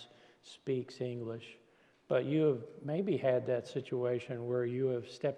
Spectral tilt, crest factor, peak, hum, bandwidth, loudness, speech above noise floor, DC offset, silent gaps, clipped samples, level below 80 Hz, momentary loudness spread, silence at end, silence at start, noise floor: -7.5 dB/octave; 18 dB; -18 dBFS; none; 10 kHz; -35 LUFS; 24 dB; under 0.1%; none; under 0.1%; -82 dBFS; 12 LU; 0 s; 0 s; -59 dBFS